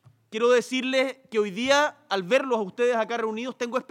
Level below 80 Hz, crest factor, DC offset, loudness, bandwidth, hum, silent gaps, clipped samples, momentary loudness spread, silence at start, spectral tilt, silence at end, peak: -74 dBFS; 20 dB; under 0.1%; -25 LUFS; 13.5 kHz; none; none; under 0.1%; 8 LU; 0.3 s; -3.5 dB/octave; 0.1 s; -6 dBFS